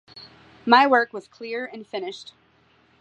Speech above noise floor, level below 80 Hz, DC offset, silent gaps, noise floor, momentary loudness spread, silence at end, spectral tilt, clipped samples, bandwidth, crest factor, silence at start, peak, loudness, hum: 38 dB; -72 dBFS; under 0.1%; none; -60 dBFS; 20 LU; 0.8 s; -4 dB/octave; under 0.1%; 8.8 kHz; 22 dB; 0.15 s; -2 dBFS; -22 LUFS; none